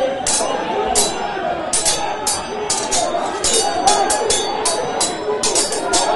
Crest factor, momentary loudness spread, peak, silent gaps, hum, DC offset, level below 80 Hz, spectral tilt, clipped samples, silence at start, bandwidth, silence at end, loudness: 18 dB; 5 LU; 0 dBFS; none; none; under 0.1%; -44 dBFS; -1 dB/octave; under 0.1%; 0 s; 12 kHz; 0 s; -17 LUFS